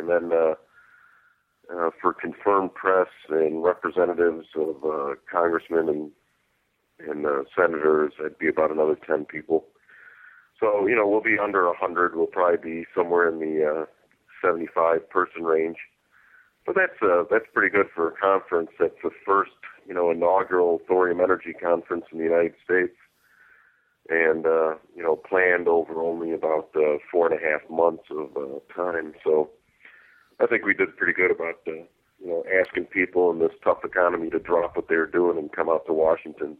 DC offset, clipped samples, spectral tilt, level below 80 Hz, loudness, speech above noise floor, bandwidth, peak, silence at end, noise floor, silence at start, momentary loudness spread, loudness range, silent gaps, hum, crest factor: under 0.1%; under 0.1%; -8.5 dB/octave; -66 dBFS; -24 LUFS; 47 dB; 4.2 kHz; -6 dBFS; 0.05 s; -71 dBFS; 0 s; 9 LU; 3 LU; none; none; 18 dB